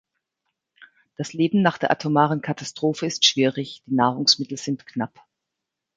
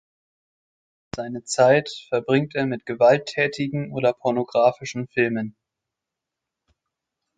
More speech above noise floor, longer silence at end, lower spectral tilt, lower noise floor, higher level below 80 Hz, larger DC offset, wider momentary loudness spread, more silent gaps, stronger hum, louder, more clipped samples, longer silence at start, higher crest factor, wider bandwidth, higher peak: about the same, 61 dB vs 64 dB; second, 0.9 s vs 1.9 s; second, -4 dB/octave vs -5.5 dB/octave; about the same, -84 dBFS vs -85 dBFS; second, -68 dBFS vs -62 dBFS; neither; about the same, 13 LU vs 13 LU; neither; neither; about the same, -22 LUFS vs -22 LUFS; neither; second, 0.8 s vs 1.15 s; about the same, 22 dB vs 20 dB; about the same, 9.4 kHz vs 9.2 kHz; about the same, -2 dBFS vs -4 dBFS